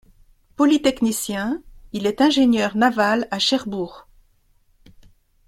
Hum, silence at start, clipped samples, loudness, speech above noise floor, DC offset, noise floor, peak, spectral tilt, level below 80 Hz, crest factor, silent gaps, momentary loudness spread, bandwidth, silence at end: none; 0.6 s; under 0.1%; -20 LUFS; 40 dB; under 0.1%; -59 dBFS; -4 dBFS; -4 dB/octave; -52 dBFS; 18 dB; none; 12 LU; 16.5 kHz; 1.45 s